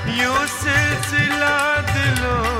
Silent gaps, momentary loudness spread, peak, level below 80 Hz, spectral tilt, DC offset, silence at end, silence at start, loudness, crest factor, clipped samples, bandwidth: none; 2 LU; -4 dBFS; -34 dBFS; -4 dB/octave; under 0.1%; 0 s; 0 s; -18 LUFS; 14 dB; under 0.1%; 16 kHz